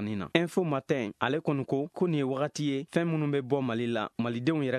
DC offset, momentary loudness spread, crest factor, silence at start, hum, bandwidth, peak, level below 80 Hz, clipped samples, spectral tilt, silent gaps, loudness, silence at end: under 0.1%; 3 LU; 22 dB; 0 s; none; 13 kHz; -8 dBFS; -68 dBFS; under 0.1%; -6.5 dB/octave; none; -30 LUFS; 0 s